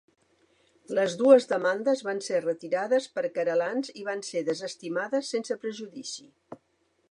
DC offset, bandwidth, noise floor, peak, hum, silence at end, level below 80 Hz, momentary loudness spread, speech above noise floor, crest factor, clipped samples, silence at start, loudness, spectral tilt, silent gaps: under 0.1%; 11 kHz; -66 dBFS; -6 dBFS; none; 0.55 s; -84 dBFS; 15 LU; 39 dB; 22 dB; under 0.1%; 0.9 s; -27 LUFS; -4 dB/octave; none